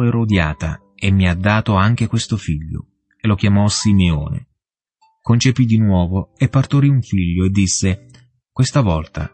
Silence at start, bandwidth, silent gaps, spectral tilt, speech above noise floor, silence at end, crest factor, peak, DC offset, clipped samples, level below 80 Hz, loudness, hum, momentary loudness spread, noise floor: 0 s; 8.8 kHz; none; -5.5 dB/octave; 60 dB; 0.05 s; 14 dB; -2 dBFS; under 0.1%; under 0.1%; -34 dBFS; -17 LUFS; none; 11 LU; -75 dBFS